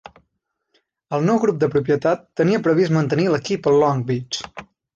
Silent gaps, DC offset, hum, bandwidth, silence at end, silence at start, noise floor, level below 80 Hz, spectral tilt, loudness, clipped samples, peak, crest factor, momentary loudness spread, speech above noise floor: none; under 0.1%; none; 7.6 kHz; 0.3 s; 1.1 s; -75 dBFS; -58 dBFS; -6.5 dB/octave; -19 LUFS; under 0.1%; -6 dBFS; 14 dB; 10 LU; 57 dB